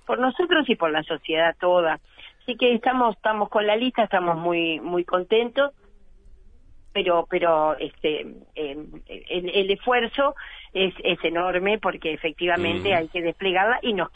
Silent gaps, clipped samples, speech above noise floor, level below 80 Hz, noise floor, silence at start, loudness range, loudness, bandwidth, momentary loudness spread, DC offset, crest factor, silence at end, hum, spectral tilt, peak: none; under 0.1%; 26 dB; -52 dBFS; -49 dBFS; 0.1 s; 3 LU; -23 LUFS; 8 kHz; 11 LU; under 0.1%; 16 dB; 0.05 s; none; -7 dB/octave; -6 dBFS